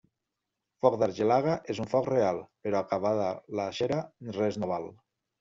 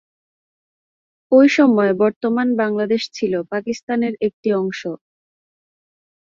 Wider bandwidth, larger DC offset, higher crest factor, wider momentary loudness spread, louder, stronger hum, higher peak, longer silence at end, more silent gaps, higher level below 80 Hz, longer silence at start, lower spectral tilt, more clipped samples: about the same, 7.6 kHz vs 7.4 kHz; neither; about the same, 22 dB vs 18 dB; second, 8 LU vs 12 LU; second, -29 LUFS vs -18 LUFS; neither; second, -8 dBFS vs -2 dBFS; second, 0.5 s vs 1.35 s; second, none vs 2.16-2.21 s, 3.83-3.87 s, 4.33-4.43 s; about the same, -68 dBFS vs -64 dBFS; second, 0.85 s vs 1.3 s; about the same, -5.5 dB/octave vs -6 dB/octave; neither